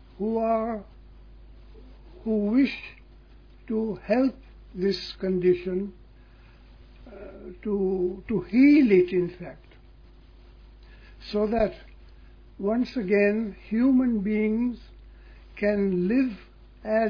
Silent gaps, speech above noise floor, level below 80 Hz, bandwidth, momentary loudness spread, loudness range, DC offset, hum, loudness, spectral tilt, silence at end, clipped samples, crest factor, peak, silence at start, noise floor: none; 27 dB; -48 dBFS; 5.4 kHz; 21 LU; 7 LU; under 0.1%; none; -25 LUFS; -8.5 dB/octave; 0 s; under 0.1%; 18 dB; -8 dBFS; 0.2 s; -51 dBFS